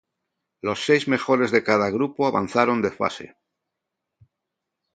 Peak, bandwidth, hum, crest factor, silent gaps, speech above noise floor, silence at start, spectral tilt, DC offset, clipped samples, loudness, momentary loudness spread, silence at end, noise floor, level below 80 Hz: -2 dBFS; 9.2 kHz; none; 22 dB; none; 61 dB; 0.65 s; -5.5 dB/octave; under 0.1%; under 0.1%; -22 LUFS; 8 LU; 1.7 s; -83 dBFS; -62 dBFS